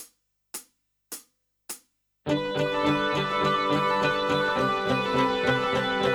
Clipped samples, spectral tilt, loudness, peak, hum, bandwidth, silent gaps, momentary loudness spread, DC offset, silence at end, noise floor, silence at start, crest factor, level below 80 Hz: under 0.1%; -4.5 dB/octave; -25 LUFS; -10 dBFS; 50 Hz at -55 dBFS; over 20 kHz; none; 17 LU; under 0.1%; 0 s; -63 dBFS; 0 s; 16 dB; -54 dBFS